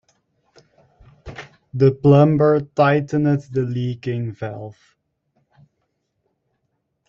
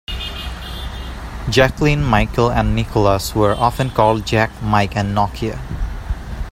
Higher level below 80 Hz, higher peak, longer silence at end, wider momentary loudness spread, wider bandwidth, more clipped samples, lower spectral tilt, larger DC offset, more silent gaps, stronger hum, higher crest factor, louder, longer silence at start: second, -54 dBFS vs -28 dBFS; about the same, -2 dBFS vs 0 dBFS; first, 2.35 s vs 0 s; first, 24 LU vs 13 LU; second, 7 kHz vs 16 kHz; neither; first, -9 dB/octave vs -6 dB/octave; neither; neither; neither; about the same, 18 dB vs 18 dB; about the same, -18 LUFS vs -18 LUFS; first, 1.25 s vs 0.1 s